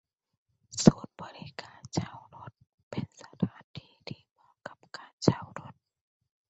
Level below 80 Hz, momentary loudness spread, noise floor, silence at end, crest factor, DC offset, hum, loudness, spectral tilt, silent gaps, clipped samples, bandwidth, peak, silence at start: -60 dBFS; 25 LU; -50 dBFS; 0.8 s; 32 dB; under 0.1%; none; -30 LUFS; -5.5 dB/octave; 2.74-2.91 s, 3.64-3.74 s, 5.13-5.18 s; under 0.1%; 8.2 kHz; -2 dBFS; 0.75 s